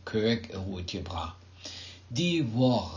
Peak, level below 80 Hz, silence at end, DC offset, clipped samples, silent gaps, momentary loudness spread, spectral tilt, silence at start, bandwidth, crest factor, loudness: -14 dBFS; -48 dBFS; 0 s; under 0.1%; under 0.1%; none; 16 LU; -6 dB/octave; 0 s; 7.6 kHz; 16 dB; -30 LUFS